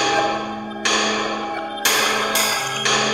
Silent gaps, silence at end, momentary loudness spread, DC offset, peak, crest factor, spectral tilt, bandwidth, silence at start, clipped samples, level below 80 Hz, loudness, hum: none; 0 s; 9 LU; 0.1%; -2 dBFS; 18 dB; -1 dB/octave; 16 kHz; 0 s; under 0.1%; -56 dBFS; -19 LUFS; none